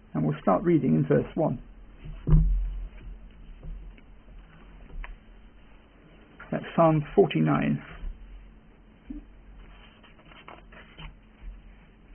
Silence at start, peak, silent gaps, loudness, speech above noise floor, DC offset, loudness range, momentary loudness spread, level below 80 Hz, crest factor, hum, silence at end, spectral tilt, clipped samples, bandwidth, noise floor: 0.15 s; -8 dBFS; none; -25 LUFS; 30 dB; under 0.1%; 21 LU; 26 LU; -36 dBFS; 22 dB; none; 0 s; -12 dB/octave; under 0.1%; 3.3 kHz; -54 dBFS